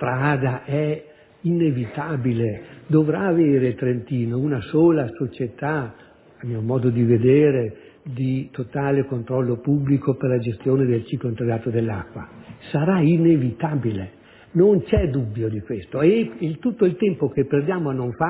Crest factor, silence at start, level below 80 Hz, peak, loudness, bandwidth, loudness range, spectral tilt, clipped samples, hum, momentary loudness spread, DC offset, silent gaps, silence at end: 16 dB; 0 s; -44 dBFS; -4 dBFS; -21 LUFS; 4 kHz; 2 LU; -12.5 dB/octave; under 0.1%; none; 12 LU; under 0.1%; none; 0 s